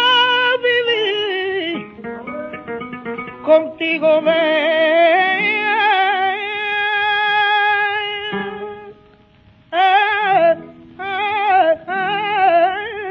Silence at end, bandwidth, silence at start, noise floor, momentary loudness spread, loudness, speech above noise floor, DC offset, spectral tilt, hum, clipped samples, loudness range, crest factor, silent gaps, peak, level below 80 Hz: 0 s; 6.4 kHz; 0 s; -49 dBFS; 15 LU; -16 LUFS; 35 dB; under 0.1%; -4.5 dB/octave; none; under 0.1%; 4 LU; 16 dB; none; -2 dBFS; -60 dBFS